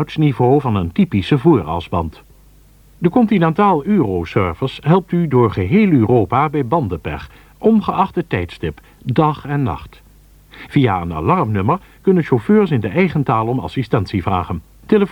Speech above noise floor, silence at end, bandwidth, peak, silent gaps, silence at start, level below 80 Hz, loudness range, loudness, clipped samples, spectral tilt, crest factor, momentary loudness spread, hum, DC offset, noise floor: 31 dB; 0 s; 18.5 kHz; 0 dBFS; none; 0 s; -42 dBFS; 4 LU; -16 LUFS; under 0.1%; -9 dB/octave; 16 dB; 9 LU; none; under 0.1%; -46 dBFS